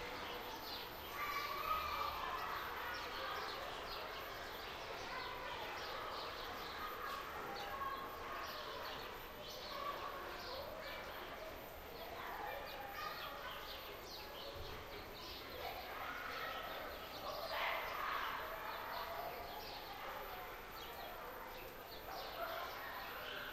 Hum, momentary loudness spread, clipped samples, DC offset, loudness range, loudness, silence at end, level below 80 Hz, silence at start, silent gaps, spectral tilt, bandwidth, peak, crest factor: none; 8 LU; under 0.1%; under 0.1%; 5 LU; -46 LUFS; 0 s; -62 dBFS; 0 s; none; -3 dB/octave; 16 kHz; -28 dBFS; 18 dB